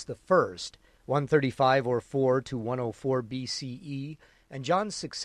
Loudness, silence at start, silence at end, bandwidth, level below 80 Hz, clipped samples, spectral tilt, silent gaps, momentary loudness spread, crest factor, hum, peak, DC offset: -28 LUFS; 0 s; 0 s; 11.5 kHz; -62 dBFS; under 0.1%; -5.5 dB/octave; none; 14 LU; 18 dB; none; -10 dBFS; under 0.1%